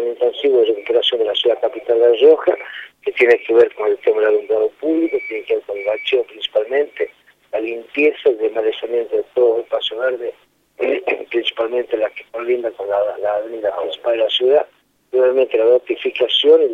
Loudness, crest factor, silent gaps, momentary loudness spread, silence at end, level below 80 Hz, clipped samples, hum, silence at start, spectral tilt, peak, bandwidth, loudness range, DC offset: -17 LUFS; 16 dB; none; 10 LU; 0 s; -66 dBFS; under 0.1%; none; 0 s; -4 dB/octave; -2 dBFS; 6.6 kHz; 6 LU; under 0.1%